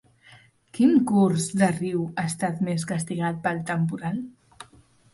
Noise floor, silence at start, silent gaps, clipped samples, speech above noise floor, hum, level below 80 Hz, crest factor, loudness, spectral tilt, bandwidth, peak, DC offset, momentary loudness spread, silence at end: -56 dBFS; 0.75 s; none; under 0.1%; 32 dB; none; -62 dBFS; 16 dB; -24 LUFS; -6 dB/octave; 11.5 kHz; -8 dBFS; under 0.1%; 11 LU; 0.5 s